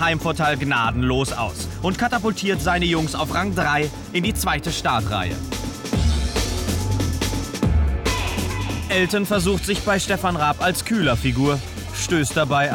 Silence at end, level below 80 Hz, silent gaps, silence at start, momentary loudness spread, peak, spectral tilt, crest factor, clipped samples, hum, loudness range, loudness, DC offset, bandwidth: 0 s; -30 dBFS; none; 0 s; 6 LU; -10 dBFS; -4.5 dB/octave; 12 dB; under 0.1%; none; 2 LU; -21 LUFS; under 0.1%; 18.5 kHz